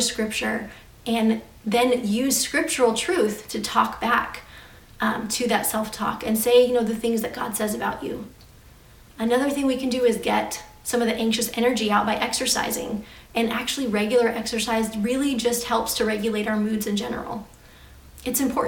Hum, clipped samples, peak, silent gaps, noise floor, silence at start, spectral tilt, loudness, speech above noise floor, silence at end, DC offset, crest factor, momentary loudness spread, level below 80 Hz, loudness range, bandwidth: none; under 0.1%; -4 dBFS; none; -49 dBFS; 0 s; -3 dB/octave; -23 LUFS; 26 dB; 0 s; under 0.1%; 20 dB; 10 LU; -52 dBFS; 3 LU; 18 kHz